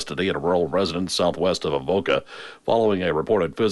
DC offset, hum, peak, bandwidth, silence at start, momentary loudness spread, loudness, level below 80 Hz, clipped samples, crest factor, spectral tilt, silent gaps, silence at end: under 0.1%; none; -8 dBFS; 11.5 kHz; 0 s; 4 LU; -22 LUFS; -50 dBFS; under 0.1%; 14 dB; -5 dB/octave; none; 0 s